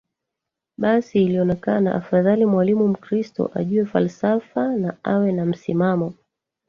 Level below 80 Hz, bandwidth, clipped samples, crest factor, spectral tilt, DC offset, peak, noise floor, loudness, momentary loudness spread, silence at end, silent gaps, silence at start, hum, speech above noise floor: -60 dBFS; 7 kHz; under 0.1%; 16 dB; -9 dB/octave; under 0.1%; -4 dBFS; -84 dBFS; -20 LUFS; 7 LU; 0.55 s; none; 0.8 s; none; 64 dB